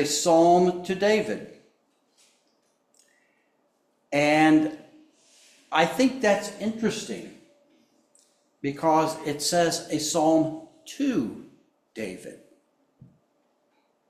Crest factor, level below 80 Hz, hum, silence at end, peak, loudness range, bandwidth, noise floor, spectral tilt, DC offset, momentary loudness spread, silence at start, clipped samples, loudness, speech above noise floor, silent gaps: 20 dB; -68 dBFS; none; 1.75 s; -6 dBFS; 7 LU; 15.5 kHz; -70 dBFS; -4 dB/octave; under 0.1%; 22 LU; 0 s; under 0.1%; -24 LUFS; 46 dB; none